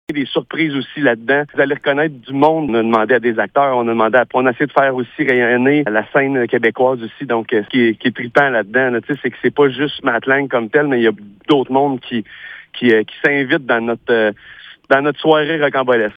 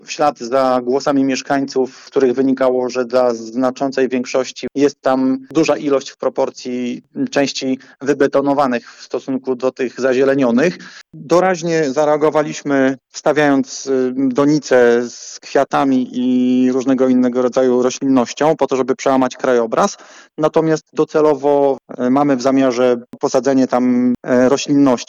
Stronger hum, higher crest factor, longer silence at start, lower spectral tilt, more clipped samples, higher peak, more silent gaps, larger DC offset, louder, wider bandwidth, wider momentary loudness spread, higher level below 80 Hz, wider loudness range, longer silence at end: neither; about the same, 14 dB vs 12 dB; about the same, 0.1 s vs 0.1 s; first, -7.5 dB/octave vs -5 dB/octave; neither; about the same, 0 dBFS vs -2 dBFS; neither; neither; about the same, -15 LUFS vs -16 LUFS; second, 6 kHz vs 8 kHz; about the same, 6 LU vs 7 LU; about the same, -60 dBFS vs -62 dBFS; about the same, 2 LU vs 3 LU; about the same, 0.05 s vs 0.05 s